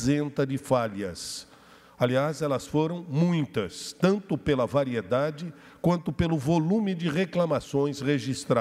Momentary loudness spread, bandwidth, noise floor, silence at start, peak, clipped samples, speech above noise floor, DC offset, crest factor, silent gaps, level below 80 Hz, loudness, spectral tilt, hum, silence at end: 7 LU; 14 kHz; -50 dBFS; 0 s; -10 dBFS; under 0.1%; 23 dB; under 0.1%; 18 dB; none; -54 dBFS; -27 LUFS; -6.5 dB/octave; none; 0 s